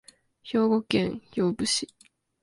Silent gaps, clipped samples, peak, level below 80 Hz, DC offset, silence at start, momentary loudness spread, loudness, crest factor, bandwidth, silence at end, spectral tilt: none; under 0.1%; -8 dBFS; -60 dBFS; under 0.1%; 0.45 s; 6 LU; -26 LUFS; 20 dB; 11.5 kHz; 0.6 s; -4.5 dB/octave